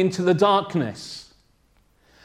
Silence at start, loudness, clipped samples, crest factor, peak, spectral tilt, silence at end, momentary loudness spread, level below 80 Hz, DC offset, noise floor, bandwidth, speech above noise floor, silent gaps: 0 s; -21 LUFS; under 0.1%; 18 dB; -6 dBFS; -6 dB/octave; 1 s; 18 LU; -62 dBFS; under 0.1%; -61 dBFS; 12 kHz; 40 dB; none